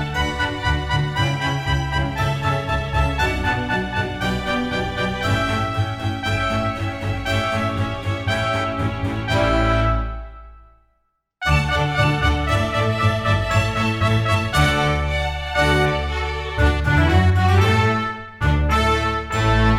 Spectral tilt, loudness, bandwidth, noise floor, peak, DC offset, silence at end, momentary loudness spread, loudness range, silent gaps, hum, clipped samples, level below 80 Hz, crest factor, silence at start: -5.5 dB/octave; -20 LUFS; 14.5 kHz; -68 dBFS; -2 dBFS; under 0.1%; 0 s; 7 LU; 4 LU; none; none; under 0.1%; -28 dBFS; 16 dB; 0 s